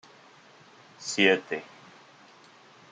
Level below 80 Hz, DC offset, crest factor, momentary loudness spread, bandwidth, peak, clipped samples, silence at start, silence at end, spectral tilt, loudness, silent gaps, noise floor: -80 dBFS; under 0.1%; 26 dB; 18 LU; 9.6 kHz; -6 dBFS; under 0.1%; 1 s; 1.25 s; -3 dB/octave; -26 LUFS; none; -55 dBFS